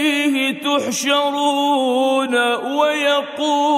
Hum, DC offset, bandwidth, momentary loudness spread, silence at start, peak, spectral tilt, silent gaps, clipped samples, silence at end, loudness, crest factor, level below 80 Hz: none; under 0.1%; 16 kHz; 2 LU; 0 s; -4 dBFS; -2 dB/octave; none; under 0.1%; 0 s; -17 LUFS; 12 dB; -76 dBFS